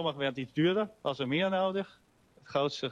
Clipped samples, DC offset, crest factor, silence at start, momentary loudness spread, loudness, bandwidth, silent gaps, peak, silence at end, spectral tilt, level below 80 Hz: under 0.1%; under 0.1%; 14 dB; 0 s; 7 LU; -31 LUFS; 9.8 kHz; none; -18 dBFS; 0 s; -6 dB/octave; -72 dBFS